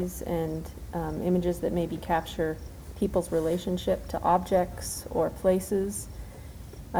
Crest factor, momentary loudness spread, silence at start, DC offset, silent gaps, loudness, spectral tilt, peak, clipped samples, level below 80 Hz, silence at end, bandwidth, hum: 18 dB; 15 LU; 0 s; under 0.1%; none; -29 LUFS; -6 dB/octave; -10 dBFS; under 0.1%; -44 dBFS; 0 s; over 20 kHz; none